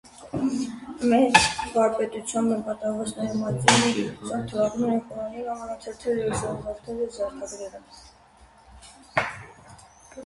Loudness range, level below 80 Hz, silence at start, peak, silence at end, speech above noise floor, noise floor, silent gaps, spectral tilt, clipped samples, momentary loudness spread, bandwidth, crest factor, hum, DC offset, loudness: 11 LU; -54 dBFS; 0.05 s; 0 dBFS; 0 s; 29 dB; -54 dBFS; none; -4 dB/octave; under 0.1%; 17 LU; 11.5 kHz; 26 dB; none; under 0.1%; -25 LUFS